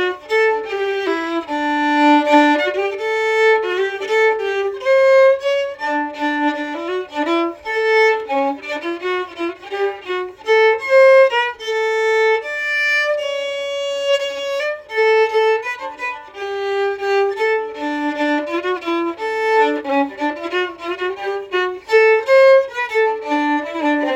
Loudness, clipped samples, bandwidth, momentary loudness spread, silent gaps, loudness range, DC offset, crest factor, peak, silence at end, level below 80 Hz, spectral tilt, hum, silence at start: -17 LUFS; under 0.1%; 13.5 kHz; 11 LU; none; 4 LU; under 0.1%; 16 dB; 0 dBFS; 0 s; -62 dBFS; -2.5 dB/octave; none; 0 s